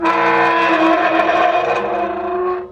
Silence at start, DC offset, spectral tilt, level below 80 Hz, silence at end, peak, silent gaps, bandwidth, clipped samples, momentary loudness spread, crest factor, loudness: 0 s; under 0.1%; -5 dB/octave; -52 dBFS; 0 s; -4 dBFS; none; 9.2 kHz; under 0.1%; 7 LU; 12 dB; -15 LUFS